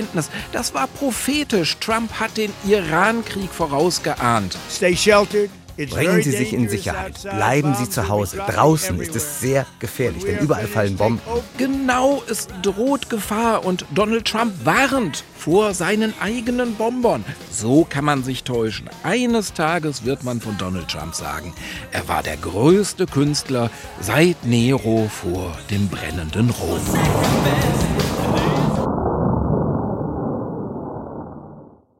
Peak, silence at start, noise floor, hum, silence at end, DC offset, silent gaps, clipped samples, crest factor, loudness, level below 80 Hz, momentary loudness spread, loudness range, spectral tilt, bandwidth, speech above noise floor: -2 dBFS; 0 s; -43 dBFS; none; 0.35 s; under 0.1%; none; under 0.1%; 18 dB; -20 LUFS; -40 dBFS; 10 LU; 3 LU; -5 dB/octave; 16.5 kHz; 23 dB